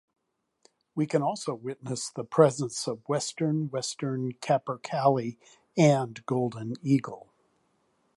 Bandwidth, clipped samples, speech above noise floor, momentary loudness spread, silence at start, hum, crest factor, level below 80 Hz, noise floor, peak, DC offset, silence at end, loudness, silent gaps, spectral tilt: 11.5 kHz; under 0.1%; 44 dB; 12 LU; 0.95 s; none; 24 dB; -74 dBFS; -71 dBFS; -6 dBFS; under 0.1%; 1 s; -28 LUFS; none; -6 dB/octave